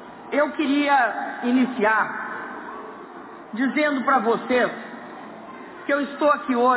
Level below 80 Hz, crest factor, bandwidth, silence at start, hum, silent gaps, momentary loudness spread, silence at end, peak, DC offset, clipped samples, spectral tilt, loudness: -68 dBFS; 14 dB; 4 kHz; 0 s; none; none; 19 LU; 0 s; -8 dBFS; under 0.1%; under 0.1%; -8.5 dB/octave; -22 LUFS